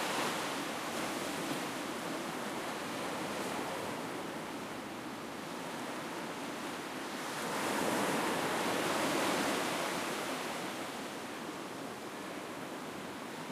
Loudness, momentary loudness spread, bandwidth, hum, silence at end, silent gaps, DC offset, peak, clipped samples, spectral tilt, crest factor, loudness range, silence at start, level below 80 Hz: -37 LUFS; 10 LU; 15.5 kHz; none; 0 s; none; under 0.1%; -20 dBFS; under 0.1%; -3 dB/octave; 18 dB; 7 LU; 0 s; -74 dBFS